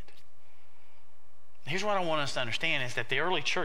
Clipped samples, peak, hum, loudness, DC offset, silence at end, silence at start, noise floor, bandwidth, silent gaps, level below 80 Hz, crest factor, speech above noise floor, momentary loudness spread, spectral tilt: under 0.1%; -14 dBFS; none; -30 LUFS; 3%; 0 s; 1.65 s; -66 dBFS; 16 kHz; none; -66 dBFS; 20 dB; 35 dB; 5 LU; -3.5 dB/octave